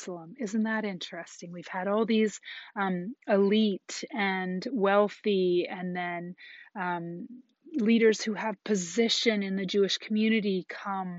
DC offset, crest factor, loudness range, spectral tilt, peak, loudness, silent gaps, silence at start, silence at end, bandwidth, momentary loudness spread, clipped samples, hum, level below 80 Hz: under 0.1%; 18 dB; 3 LU; -4 dB/octave; -10 dBFS; -28 LUFS; none; 0 s; 0 s; 8 kHz; 15 LU; under 0.1%; none; -80 dBFS